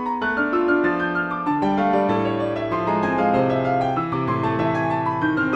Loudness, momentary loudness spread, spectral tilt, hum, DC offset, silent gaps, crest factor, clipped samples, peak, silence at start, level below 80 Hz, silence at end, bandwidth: -21 LUFS; 4 LU; -8 dB/octave; none; under 0.1%; none; 14 dB; under 0.1%; -8 dBFS; 0 s; -52 dBFS; 0 s; 8 kHz